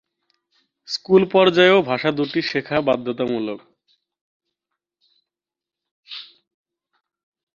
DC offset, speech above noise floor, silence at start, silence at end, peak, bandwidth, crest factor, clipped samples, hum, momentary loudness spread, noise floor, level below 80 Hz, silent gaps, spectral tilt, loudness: under 0.1%; 71 dB; 0.9 s; 1.35 s; -2 dBFS; 7.2 kHz; 20 dB; under 0.1%; none; 22 LU; -89 dBFS; -64 dBFS; 4.21-4.40 s, 5.91-6.03 s; -6 dB/octave; -18 LUFS